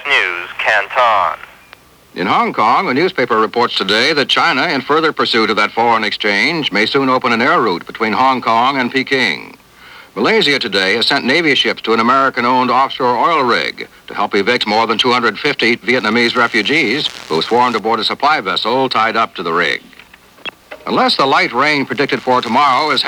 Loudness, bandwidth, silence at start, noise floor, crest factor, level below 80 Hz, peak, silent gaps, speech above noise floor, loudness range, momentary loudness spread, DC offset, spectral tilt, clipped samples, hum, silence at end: -13 LUFS; over 20 kHz; 0 s; -43 dBFS; 14 dB; -58 dBFS; 0 dBFS; none; 29 dB; 2 LU; 6 LU; under 0.1%; -4 dB/octave; under 0.1%; none; 0 s